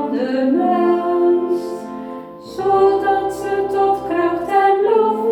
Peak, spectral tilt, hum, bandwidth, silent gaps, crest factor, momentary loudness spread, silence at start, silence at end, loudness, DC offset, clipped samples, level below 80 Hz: -4 dBFS; -6 dB/octave; none; 13 kHz; none; 14 dB; 14 LU; 0 s; 0 s; -17 LUFS; under 0.1%; under 0.1%; -52 dBFS